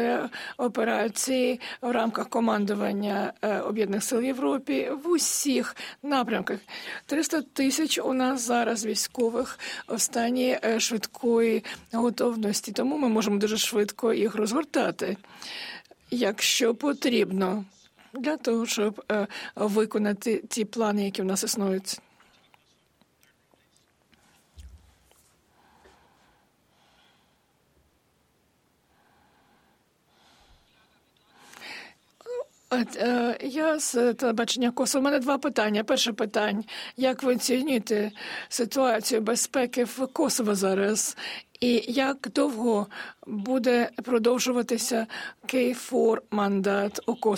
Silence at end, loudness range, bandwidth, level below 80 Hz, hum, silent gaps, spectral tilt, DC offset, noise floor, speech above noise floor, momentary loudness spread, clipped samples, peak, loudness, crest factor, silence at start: 0 s; 3 LU; 17 kHz; -68 dBFS; none; none; -3.5 dB/octave; under 0.1%; -67 dBFS; 41 dB; 10 LU; under 0.1%; -12 dBFS; -26 LUFS; 16 dB; 0 s